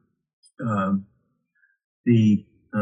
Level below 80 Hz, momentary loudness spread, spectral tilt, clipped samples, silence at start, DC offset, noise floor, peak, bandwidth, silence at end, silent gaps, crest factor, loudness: -68 dBFS; 12 LU; -9 dB/octave; under 0.1%; 0.6 s; under 0.1%; -69 dBFS; -8 dBFS; 7.8 kHz; 0 s; 1.84-2.04 s; 18 dB; -23 LUFS